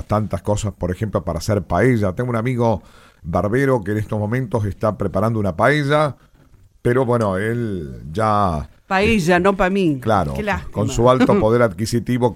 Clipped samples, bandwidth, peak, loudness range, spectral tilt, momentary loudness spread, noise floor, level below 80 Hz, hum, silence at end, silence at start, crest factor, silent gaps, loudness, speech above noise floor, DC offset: under 0.1%; 15.5 kHz; 0 dBFS; 4 LU; -6.5 dB/octave; 8 LU; -50 dBFS; -38 dBFS; none; 0 s; 0.1 s; 18 dB; none; -19 LUFS; 32 dB; under 0.1%